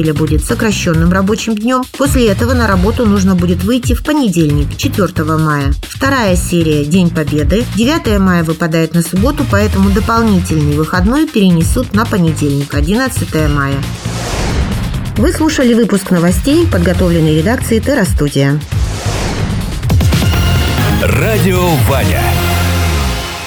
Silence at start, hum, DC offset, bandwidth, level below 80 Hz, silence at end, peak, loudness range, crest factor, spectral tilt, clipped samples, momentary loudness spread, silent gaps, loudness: 0 s; none; under 0.1%; over 20 kHz; -20 dBFS; 0 s; 0 dBFS; 2 LU; 12 dB; -6 dB/octave; under 0.1%; 5 LU; none; -12 LUFS